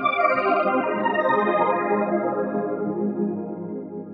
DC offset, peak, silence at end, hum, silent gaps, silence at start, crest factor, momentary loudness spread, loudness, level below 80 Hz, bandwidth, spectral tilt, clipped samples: under 0.1%; -8 dBFS; 0 s; none; none; 0 s; 16 dB; 11 LU; -23 LUFS; -74 dBFS; 5 kHz; -4.5 dB/octave; under 0.1%